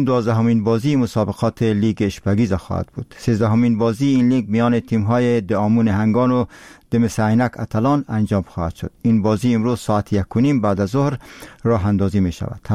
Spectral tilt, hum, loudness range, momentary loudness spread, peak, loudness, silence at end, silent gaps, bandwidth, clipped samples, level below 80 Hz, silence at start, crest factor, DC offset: -8 dB/octave; none; 2 LU; 7 LU; -8 dBFS; -18 LUFS; 0 s; none; 13 kHz; under 0.1%; -44 dBFS; 0 s; 10 dB; 0.1%